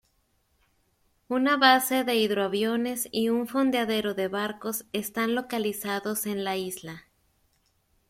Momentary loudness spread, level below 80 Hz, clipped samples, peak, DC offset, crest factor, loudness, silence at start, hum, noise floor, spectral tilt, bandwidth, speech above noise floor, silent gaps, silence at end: 11 LU; -68 dBFS; under 0.1%; -4 dBFS; under 0.1%; 24 dB; -26 LUFS; 1.3 s; none; -70 dBFS; -3.5 dB/octave; 16.5 kHz; 44 dB; none; 1.1 s